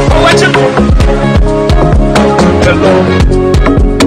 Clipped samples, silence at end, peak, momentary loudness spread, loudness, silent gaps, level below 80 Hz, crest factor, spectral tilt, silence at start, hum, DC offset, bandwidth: 0.8%; 0 s; 0 dBFS; 3 LU; -7 LUFS; none; -12 dBFS; 6 dB; -6 dB/octave; 0 s; none; under 0.1%; 11.5 kHz